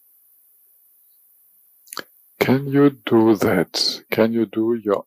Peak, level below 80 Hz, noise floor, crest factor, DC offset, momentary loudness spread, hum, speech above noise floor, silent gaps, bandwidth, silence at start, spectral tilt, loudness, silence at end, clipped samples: -4 dBFS; -62 dBFS; -56 dBFS; 16 dB; under 0.1%; 18 LU; none; 38 dB; none; 15.5 kHz; 2.4 s; -5.5 dB/octave; -19 LUFS; 0.05 s; under 0.1%